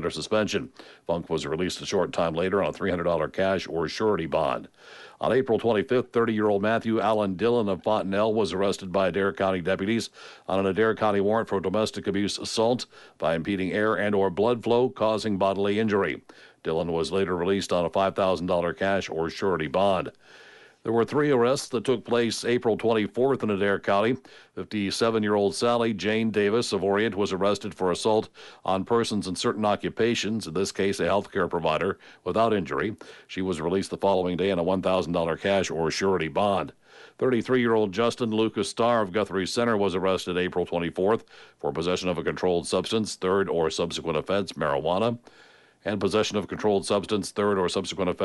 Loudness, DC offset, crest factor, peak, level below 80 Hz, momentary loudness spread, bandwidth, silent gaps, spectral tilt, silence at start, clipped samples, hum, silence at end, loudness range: -26 LUFS; under 0.1%; 14 dB; -12 dBFS; -58 dBFS; 6 LU; 11.5 kHz; none; -5 dB/octave; 0 s; under 0.1%; none; 0 s; 2 LU